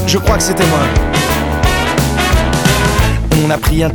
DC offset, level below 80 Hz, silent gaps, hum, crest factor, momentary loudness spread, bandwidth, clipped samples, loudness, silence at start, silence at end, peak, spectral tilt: under 0.1%; -18 dBFS; none; none; 12 dB; 2 LU; 19.5 kHz; under 0.1%; -12 LUFS; 0 s; 0 s; 0 dBFS; -4.5 dB/octave